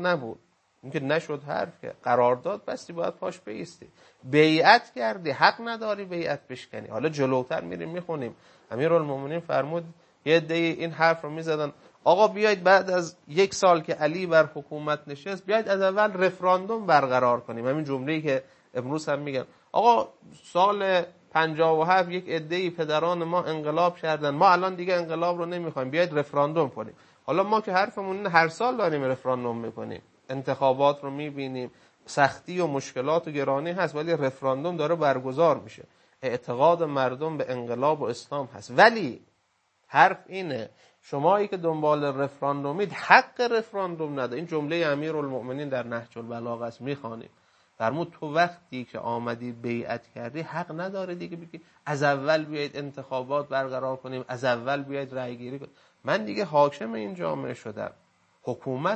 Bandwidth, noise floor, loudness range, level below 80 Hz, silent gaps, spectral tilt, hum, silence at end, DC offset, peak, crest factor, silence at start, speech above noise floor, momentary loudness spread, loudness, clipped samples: 8.6 kHz; -71 dBFS; 7 LU; -74 dBFS; none; -5.5 dB/octave; none; 0 s; under 0.1%; 0 dBFS; 26 dB; 0 s; 45 dB; 14 LU; -26 LUFS; under 0.1%